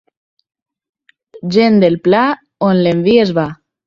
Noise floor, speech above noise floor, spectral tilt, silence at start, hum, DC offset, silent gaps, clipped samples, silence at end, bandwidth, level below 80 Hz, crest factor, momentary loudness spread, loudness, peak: -42 dBFS; 30 dB; -7.5 dB/octave; 1.35 s; none; under 0.1%; none; under 0.1%; 0.35 s; 7.4 kHz; -52 dBFS; 14 dB; 8 LU; -13 LUFS; 0 dBFS